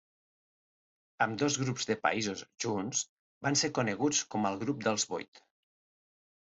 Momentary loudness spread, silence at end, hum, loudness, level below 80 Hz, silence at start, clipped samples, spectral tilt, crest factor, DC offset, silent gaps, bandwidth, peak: 8 LU; 1.1 s; none; -32 LUFS; -72 dBFS; 1.2 s; under 0.1%; -3.5 dB/octave; 20 dB; under 0.1%; 3.09-3.41 s, 5.28-5.32 s; 8.2 kHz; -14 dBFS